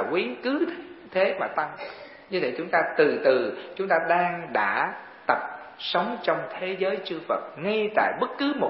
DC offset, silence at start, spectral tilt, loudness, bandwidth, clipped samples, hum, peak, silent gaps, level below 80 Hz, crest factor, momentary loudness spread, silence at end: under 0.1%; 0 s; -9 dB/octave; -26 LUFS; 5.8 kHz; under 0.1%; none; -6 dBFS; none; -72 dBFS; 20 dB; 10 LU; 0 s